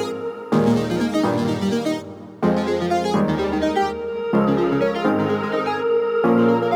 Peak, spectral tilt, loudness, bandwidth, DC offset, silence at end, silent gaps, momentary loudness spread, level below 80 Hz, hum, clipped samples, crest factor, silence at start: -6 dBFS; -7 dB/octave; -20 LUFS; 15 kHz; under 0.1%; 0 s; none; 6 LU; -48 dBFS; none; under 0.1%; 14 dB; 0 s